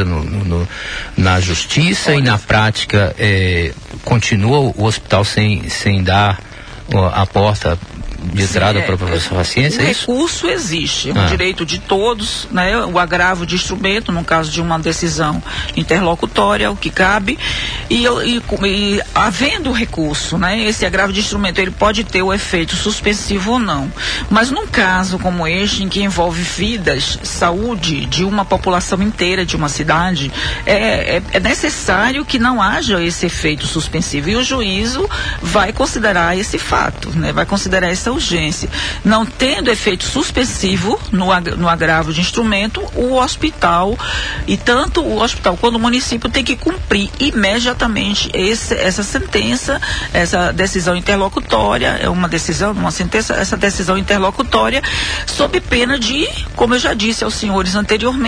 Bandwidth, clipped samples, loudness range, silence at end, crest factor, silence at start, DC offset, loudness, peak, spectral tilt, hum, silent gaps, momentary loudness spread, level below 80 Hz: 10.5 kHz; under 0.1%; 1 LU; 0 s; 14 dB; 0 s; under 0.1%; -15 LUFS; 0 dBFS; -4 dB/octave; none; none; 5 LU; -28 dBFS